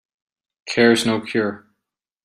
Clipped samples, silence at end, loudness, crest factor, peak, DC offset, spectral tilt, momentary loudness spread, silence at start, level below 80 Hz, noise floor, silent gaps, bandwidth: under 0.1%; 0.7 s; -19 LUFS; 20 dB; -2 dBFS; under 0.1%; -4.5 dB/octave; 11 LU; 0.65 s; -60 dBFS; -81 dBFS; none; 15 kHz